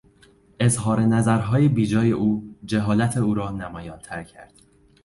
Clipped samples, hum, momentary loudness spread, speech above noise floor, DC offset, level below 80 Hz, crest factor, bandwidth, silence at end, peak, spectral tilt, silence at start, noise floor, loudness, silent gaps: under 0.1%; none; 16 LU; 34 dB; under 0.1%; -48 dBFS; 16 dB; 11.5 kHz; 0.6 s; -6 dBFS; -6.5 dB/octave; 0.6 s; -55 dBFS; -21 LUFS; none